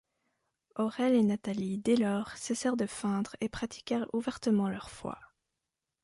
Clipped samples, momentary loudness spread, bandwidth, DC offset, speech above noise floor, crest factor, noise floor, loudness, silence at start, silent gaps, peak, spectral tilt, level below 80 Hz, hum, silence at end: under 0.1%; 13 LU; 11.5 kHz; under 0.1%; 56 dB; 16 dB; -87 dBFS; -32 LUFS; 0.75 s; none; -16 dBFS; -5.5 dB/octave; -64 dBFS; none; 0.8 s